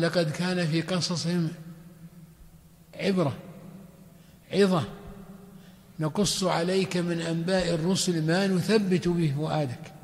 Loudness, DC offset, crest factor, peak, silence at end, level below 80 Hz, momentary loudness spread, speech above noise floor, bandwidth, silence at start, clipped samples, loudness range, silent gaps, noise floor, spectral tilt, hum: -27 LUFS; under 0.1%; 16 dB; -10 dBFS; 0.05 s; -56 dBFS; 22 LU; 27 dB; 15 kHz; 0 s; under 0.1%; 6 LU; none; -53 dBFS; -5.5 dB/octave; none